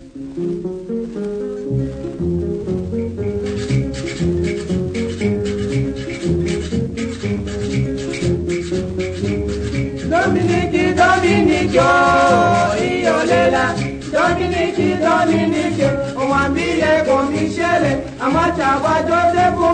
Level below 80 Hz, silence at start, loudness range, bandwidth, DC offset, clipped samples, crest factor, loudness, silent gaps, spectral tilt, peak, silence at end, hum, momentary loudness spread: -36 dBFS; 0 s; 7 LU; 9.6 kHz; under 0.1%; under 0.1%; 16 dB; -17 LUFS; none; -6 dB/octave; 0 dBFS; 0 s; none; 10 LU